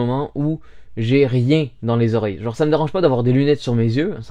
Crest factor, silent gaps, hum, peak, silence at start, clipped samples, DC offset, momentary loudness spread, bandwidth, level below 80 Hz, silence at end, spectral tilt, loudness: 14 dB; none; none; -2 dBFS; 0 s; under 0.1%; under 0.1%; 8 LU; 8.6 kHz; -48 dBFS; 0 s; -8.5 dB/octave; -18 LUFS